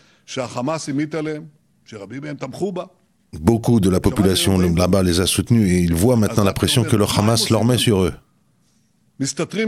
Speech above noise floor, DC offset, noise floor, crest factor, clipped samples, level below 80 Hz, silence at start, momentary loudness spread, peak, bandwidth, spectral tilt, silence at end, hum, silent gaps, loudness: 43 dB; under 0.1%; -61 dBFS; 18 dB; under 0.1%; -42 dBFS; 0.3 s; 14 LU; 0 dBFS; 16 kHz; -5.5 dB/octave; 0 s; none; none; -18 LUFS